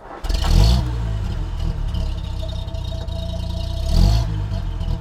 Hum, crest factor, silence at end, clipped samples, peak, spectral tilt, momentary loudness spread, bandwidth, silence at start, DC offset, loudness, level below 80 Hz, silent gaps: none; 18 dB; 0 s; under 0.1%; -2 dBFS; -6 dB/octave; 11 LU; 13.5 kHz; 0 s; under 0.1%; -23 LUFS; -22 dBFS; none